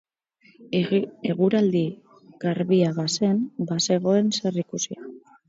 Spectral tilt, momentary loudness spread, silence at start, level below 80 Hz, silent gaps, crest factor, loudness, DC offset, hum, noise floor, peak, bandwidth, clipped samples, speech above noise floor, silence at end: -5.5 dB/octave; 10 LU; 0.6 s; -70 dBFS; none; 16 dB; -24 LUFS; under 0.1%; none; -60 dBFS; -8 dBFS; 7.8 kHz; under 0.1%; 37 dB; 0.3 s